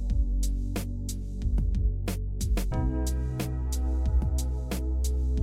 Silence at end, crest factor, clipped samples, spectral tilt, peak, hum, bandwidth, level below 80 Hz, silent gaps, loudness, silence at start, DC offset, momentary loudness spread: 0 s; 10 dB; under 0.1%; -6 dB/octave; -16 dBFS; none; 15.5 kHz; -28 dBFS; none; -30 LUFS; 0 s; under 0.1%; 5 LU